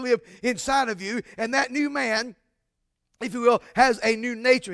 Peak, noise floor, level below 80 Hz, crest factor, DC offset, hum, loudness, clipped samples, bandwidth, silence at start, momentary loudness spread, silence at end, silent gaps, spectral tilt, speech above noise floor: -6 dBFS; -78 dBFS; -58 dBFS; 20 dB; under 0.1%; none; -24 LUFS; under 0.1%; 11 kHz; 0 s; 10 LU; 0 s; none; -3 dB/octave; 54 dB